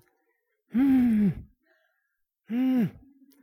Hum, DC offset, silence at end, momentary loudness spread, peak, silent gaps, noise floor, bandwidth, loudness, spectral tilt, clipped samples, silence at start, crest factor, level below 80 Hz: none; under 0.1%; 0.5 s; 11 LU; -16 dBFS; none; -79 dBFS; 15 kHz; -25 LUFS; -9 dB/octave; under 0.1%; 0.75 s; 12 dB; -56 dBFS